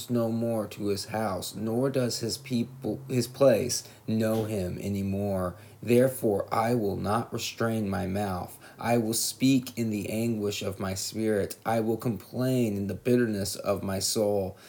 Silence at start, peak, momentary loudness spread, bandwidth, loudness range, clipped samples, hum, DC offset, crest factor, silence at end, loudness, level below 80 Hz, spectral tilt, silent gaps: 0 s; -10 dBFS; 8 LU; 19.5 kHz; 1 LU; under 0.1%; none; under 0.1%; 18 dB; 0 s; -28 LUFS; -64 dBFS; -5 dB/octave; none